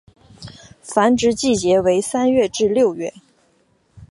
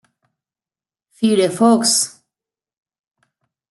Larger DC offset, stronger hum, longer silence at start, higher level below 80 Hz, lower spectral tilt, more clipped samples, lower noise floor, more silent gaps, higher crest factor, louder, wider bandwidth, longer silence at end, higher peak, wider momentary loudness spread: neither; neither; second, 0.4 s vs 1.2 s; first, -50 dBFS vs -70 dBFS; about the same, -4.5 dB/octave vs -3.5 dB/octave; neither; second, -60 dBFS vs under -90 dBFS; neither; about the same, 18 dB vs 18 dB; about the same, -17 LUFS vs -15 LUFS; about the same, 11.5 kHz vs 12 kHz; second, 0.05 s vs 1.65 s; about the same, -2 dBFS vs -4 dBFS; first, 17 LU vs 8 LU